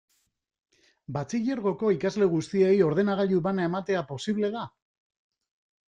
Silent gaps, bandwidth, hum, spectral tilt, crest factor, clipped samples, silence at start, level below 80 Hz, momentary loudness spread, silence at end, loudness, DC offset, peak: none; 9.2 kHz; none; -7 dB/octave; 16 dB; under 0.1%; 1.1 s; -64 dBFS; 10 LU; 1.2 s; -26 LUFS; under 0.1%; -10 dBFS